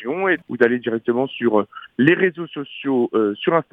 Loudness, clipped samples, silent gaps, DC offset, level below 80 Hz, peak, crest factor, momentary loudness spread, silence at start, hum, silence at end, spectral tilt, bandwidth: -20 LUFS; under 0.1%; none; under 0.1%; -66 dBFS; 0 dBFS; 20 dB; 9 LU; 0 s; none; 0.1 s; -8.5 dB/octave; 4 kHz